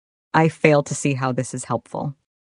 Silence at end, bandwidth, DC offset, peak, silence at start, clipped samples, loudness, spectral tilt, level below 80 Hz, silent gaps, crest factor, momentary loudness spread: 0.45 s; 11 kHz; under 0.1%; 0 dBFS; 0.35 s; under 0.1%; -21 LUFS; -5.5 dB/octave; -62 dBFS; none; 22 dB; 13 LU